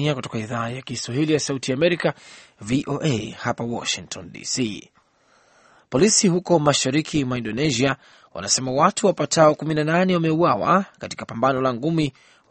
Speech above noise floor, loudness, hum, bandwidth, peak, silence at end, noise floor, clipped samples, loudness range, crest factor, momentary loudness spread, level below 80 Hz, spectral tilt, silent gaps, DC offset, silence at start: 38 dB; -21 LUFS; none; 8.8 kHz; -2 dBFS; 0.4 s; -59 dBFS; under 0.1%; 7 LU; 20 dB; 12 LU; -54 dBFS; -4.5 dB/octave; none; under 0.1%; 0 s